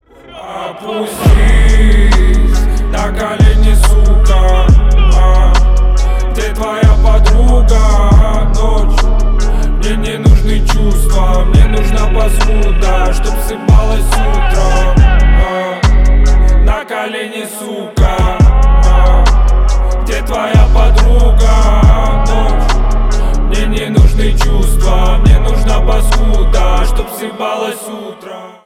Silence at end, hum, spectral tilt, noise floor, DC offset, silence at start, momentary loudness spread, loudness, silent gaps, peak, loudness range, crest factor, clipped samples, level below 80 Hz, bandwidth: 0.15 s; none; -6 dB/octave; -31 dBFS; under 0.1%; 0.3 s; 8 LU; -12 LUFS; none; 0 dBFS; 2 LU; 8 dB; under 0.1%; -8 dBFS; 13.5 kHz